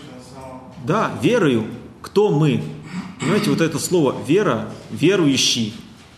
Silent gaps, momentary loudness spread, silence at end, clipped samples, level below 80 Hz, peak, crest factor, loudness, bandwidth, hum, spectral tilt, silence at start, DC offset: none; 19 LU; 0.25 s; under 0.1%; -54 dBFS; -4 dBFS; 16 dB; -19 LUFS; 13 kHz; none; -5 dB/octave; 0 s; under 0.1%